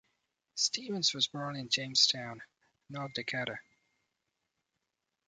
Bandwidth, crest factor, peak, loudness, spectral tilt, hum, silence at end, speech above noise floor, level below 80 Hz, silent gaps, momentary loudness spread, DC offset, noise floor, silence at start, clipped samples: 10.5 kHz; 26 dB; -10 dBFS; -31 LUFS; -1.5 dB/octave; none; 1.65 s; 52 dB; -78 dBFS; none; 19 LU; under 0.1%; -86 dBFS; 0.55 s; under 0.1%